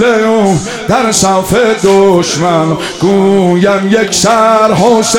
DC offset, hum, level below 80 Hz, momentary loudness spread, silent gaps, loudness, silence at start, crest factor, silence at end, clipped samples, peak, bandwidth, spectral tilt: 0.4%; none; -40 dBFS; 4 LU; none; -9 LUFS; 0 s; 8 dB; 0 s; 0.8%; 0 dBFS; 17 kHz; -4.5 dB/octave